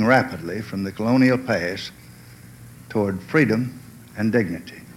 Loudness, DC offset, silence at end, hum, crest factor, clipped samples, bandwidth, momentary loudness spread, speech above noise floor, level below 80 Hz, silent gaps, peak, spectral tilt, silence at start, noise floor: -22 LUFS; under 0.1%; 0.05 s; none; 20 dB; under 0.1%; 16 kHz; 14 LU; 23 dB; -56 dBFS; none; -4 dBFS; -7 dB/octave; 0 s; -44 dBFS